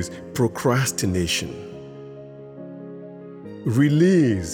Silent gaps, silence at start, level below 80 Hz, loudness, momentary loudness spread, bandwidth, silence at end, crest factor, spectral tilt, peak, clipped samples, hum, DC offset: none; 0 s; -50 dBFS; -21 LUFS; 22 LU; 18.5 kHz; 0 s; 16 dB; -5.5 dB/octave; -6 dBFS; under 0.1%; none; under 0.1%